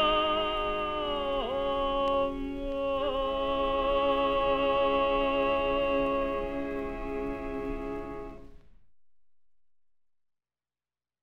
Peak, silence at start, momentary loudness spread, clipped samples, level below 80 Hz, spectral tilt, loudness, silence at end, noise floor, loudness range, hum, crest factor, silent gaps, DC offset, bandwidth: -16 dBFS; 0 s; 9 LU; under 0.1%; -44 dBFS; -6 dB/octave; -29 LUFS; 0 s; under -90 dBFS; 13 LU; 60 Hz at -55 dBFS; 14 dB; none; 0.3%; 6.6 kHz